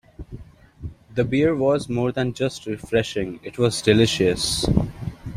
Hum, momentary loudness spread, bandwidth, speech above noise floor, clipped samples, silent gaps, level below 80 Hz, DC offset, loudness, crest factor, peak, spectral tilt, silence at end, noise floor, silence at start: none; 21 LU; 15.5 kHz; 21 dB; under 0.1%; none; -40 dBFS; under 0.1%; -22 LUFS; 20 dB; -2 dBFS; -5 dB/octave; 0 s; -41 dBFS; 0.2 s